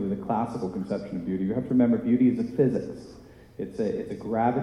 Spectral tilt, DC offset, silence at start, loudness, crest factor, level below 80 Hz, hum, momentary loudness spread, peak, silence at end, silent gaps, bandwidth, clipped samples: -9 dB/octave; under 0.1%; 0 s; -26 LUFS; 16 dB; -56 dBFS; none; 16 LU; -10 dBFS; 0 s; none; 6.6 kHz; under 0.1%